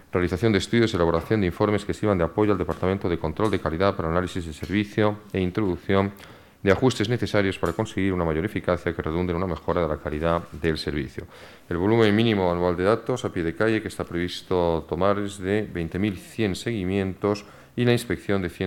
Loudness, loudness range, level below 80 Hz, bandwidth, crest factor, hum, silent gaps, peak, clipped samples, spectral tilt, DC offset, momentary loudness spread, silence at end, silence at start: -24 LUFS; 3 LU; -44 dBFS; 17 kHz; 18 dB; none; none; -6 dBFS; under 0.1%; -6.5 dB/octave; under 0.1%; 7 LU; 0 s; 0.15 s